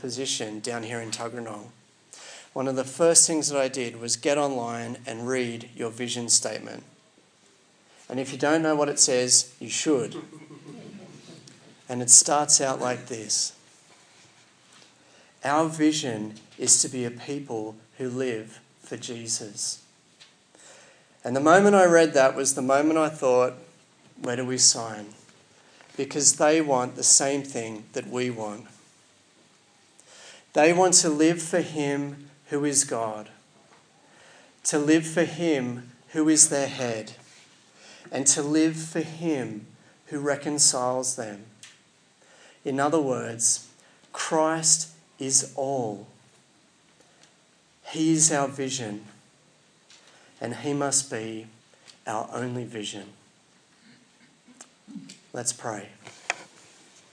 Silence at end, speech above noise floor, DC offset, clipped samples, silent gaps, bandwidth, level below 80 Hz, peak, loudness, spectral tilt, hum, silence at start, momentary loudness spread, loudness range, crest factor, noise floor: 0.7 s; 36 dB; under 0.1%; under 0.1%; none; 10.5 kHz; -84 dBFS; 0 dBFS; -23 LUFS; -2.5 dB/octave; none; 0 s; 20 LU; 10 LU; 26 dB; -61 dBFS